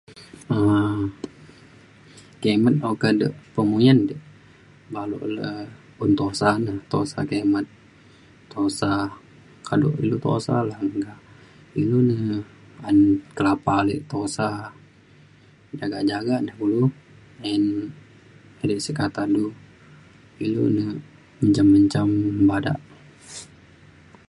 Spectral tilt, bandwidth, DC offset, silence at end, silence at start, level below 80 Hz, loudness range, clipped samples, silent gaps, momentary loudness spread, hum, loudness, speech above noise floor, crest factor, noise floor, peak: -7 dB/octave; 11.5 kHz; under 0.1%; 0.85 s; 0.1 s; -52 dBFS; 5 LU; under 0.1%; none; 18 LU; none; -22 LUFS; 31 dB; 20 dB; -52 dBFS; -4 dBFS